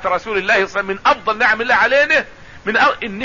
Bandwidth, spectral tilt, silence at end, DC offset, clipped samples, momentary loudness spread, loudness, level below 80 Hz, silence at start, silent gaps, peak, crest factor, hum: 7.4 kHz; -3.5 dB/octave; 0 s; 0.6%; under 0.1%; 7 LU; -15 LUFS; -48 dBFS; 0 s; none; -2 dBFS; 14 dB; none